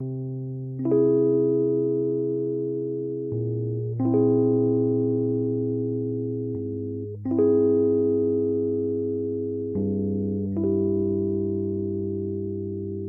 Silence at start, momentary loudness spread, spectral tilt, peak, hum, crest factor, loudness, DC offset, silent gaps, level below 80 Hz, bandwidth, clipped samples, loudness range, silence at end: 0 s; 10 LU; -15.5 dB/octave; -10 dBFS; none; 14 dB; -25 LUFS; under 0.1%; none; -60 dBFS; 1.8 kHz; under 0.1%; 2 LU; 0 s